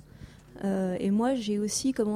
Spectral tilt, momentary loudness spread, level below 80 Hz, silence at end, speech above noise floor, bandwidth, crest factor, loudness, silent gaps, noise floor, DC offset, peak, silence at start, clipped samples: -5 dB/octave; 7 LU; -58 dBFS; 0 s; 22 dB; 15 kHz; 12 dB; -28 LUFS; none; -49 dBFS; under 0.1%; -16 dBFS; 0.2 s; under 0.1%